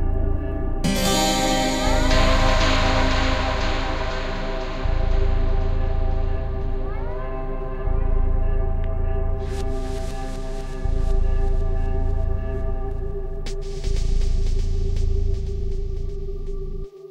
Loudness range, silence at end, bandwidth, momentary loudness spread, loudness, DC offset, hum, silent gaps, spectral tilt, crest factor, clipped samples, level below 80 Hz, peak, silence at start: 7 LU; 0.05 s; 14 kHz; 12 LU; -25 LUFS; 0.2%; none; none; -5 dB/octave; 16 dB; under 0.1%; -22 dBFS; -4 dBFS; 0 s